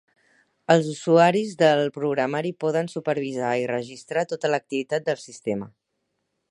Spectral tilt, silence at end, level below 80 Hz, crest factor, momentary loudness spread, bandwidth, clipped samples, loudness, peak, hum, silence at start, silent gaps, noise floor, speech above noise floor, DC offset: -5.5 dB/octave; 0.8 s; -72 dBFS; 20 dB; 11 LU; 11 kHz; under 0.1%; -23 LUFS; -4 dBFS; none; 0.7 s; none; -77 dBFS; 54 dB; under 0.1%